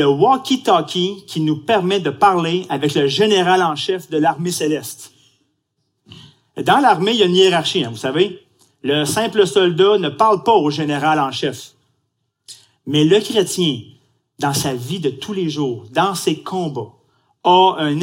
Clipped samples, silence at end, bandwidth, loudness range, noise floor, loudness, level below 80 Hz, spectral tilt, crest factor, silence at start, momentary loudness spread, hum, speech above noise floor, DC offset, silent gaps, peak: under 0.1%; 0 s; 16.5 kHz; 5 LU; -70 dBFS; -16 LUFS; -64 dBFS; -4.5 dB/octave; 16 dB; 0 s; 10 LU; none; 54 dB; under 0.1%; none; -2 dBFS